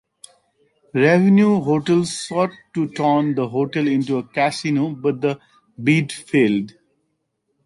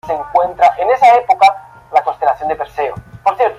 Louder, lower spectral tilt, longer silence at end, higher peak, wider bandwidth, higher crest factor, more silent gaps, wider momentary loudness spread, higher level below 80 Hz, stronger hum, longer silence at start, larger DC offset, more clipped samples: second, -19 LUFS vs -13 LUFS; first, -6.5 dB/octave vs -4 dB/octave; first, 0.95 s vs 0.05 s; about the same, -2 dBFS vs -2 dBFS; about the same, 11.5 kHz vs 11 kHz; about the same, 16 dB vs 12 dB; neither; about the same, 10 LU vs 11 LU; second, -64 dBFS vs -48 dBFS; neither; first, 0.95 s vs 0.05 s; neither; neither